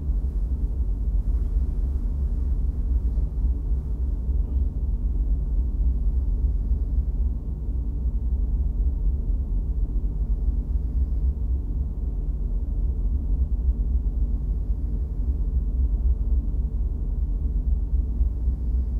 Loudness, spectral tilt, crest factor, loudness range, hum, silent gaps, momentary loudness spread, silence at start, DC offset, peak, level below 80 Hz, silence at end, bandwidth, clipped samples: -27 LUFS; -11.5 dB/octave; 12 dB; 1 LU; none; none; 3 LU; 0 s; under 0.1%; -12 dBFS; -24 dBFS; 0 s; 1.3 kHz; under 0.1%